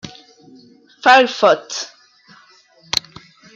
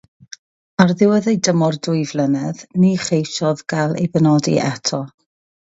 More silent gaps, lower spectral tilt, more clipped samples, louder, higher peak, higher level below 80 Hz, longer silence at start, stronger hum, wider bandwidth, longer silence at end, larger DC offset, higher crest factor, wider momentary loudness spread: neither; second, -2 dB/octave vs -5.5 dB/octave; neither; about the same, -15 LUFS vs -17 LUFS; about the same, 0 dBFS vs 0 dBFS; about the same, -60 dBFS vs -58 dBFS; second, 0.05 s vs 0.8 s; neither; first, 15.5 kHz vs 8 kHz; second, 0.55 s vs 0.7 s; neither; about the same, 18 dB vs 18 dB; first, 18 LU vs 7 LU